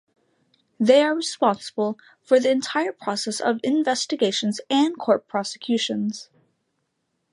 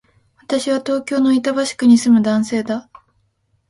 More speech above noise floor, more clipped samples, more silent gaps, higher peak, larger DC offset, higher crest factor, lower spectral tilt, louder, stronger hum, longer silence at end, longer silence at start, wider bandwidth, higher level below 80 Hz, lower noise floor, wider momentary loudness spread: first, 53 dB vs 49 dB; neither; neither; about the same, -4 dBFS vs -2 dBFS; neither; about the same, 20 dB vs 16 dB; about the same, -4 dB/octave vs -5 dB/octave; second, -22 LUFS vs -16 LUFS; neither; first, 1.1 s vs 0.9 s; first, 0.8 s vs 0.5 s; about the same, 11.5 kHz vs 11.5 kHz; second, -78 dBFS vs -60 dBFS; first, -75 dBFS vs -64 dBFS; about the same, 10 LU vs 10 LU